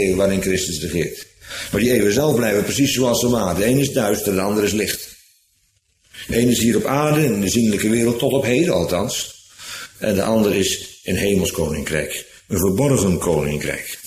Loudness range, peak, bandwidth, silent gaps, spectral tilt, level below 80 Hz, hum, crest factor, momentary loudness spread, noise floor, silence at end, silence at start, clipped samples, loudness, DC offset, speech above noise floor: 3 LU; -4 dBFS; 15.5 kHz; none; -4.5 dB/octave; -42 dBFS; none; 16 dB; 10 LU; -63 dBFS; 0 s; 0 s; under 0.1%; -19 LUFS; under 0.1%; 45 dB